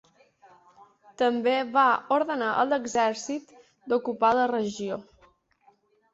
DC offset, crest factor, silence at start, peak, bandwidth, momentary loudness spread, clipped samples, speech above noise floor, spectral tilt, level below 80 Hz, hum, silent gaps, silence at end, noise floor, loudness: under 0.1%; 18 dB; 1.2 s; -10 dBFS; 8 kHz; 12 LU; under 0.1%; 39 dB; -4 dB/octave; -70 dBFS; none; none; 1.1 s; -64 dBFS; -25 LUFS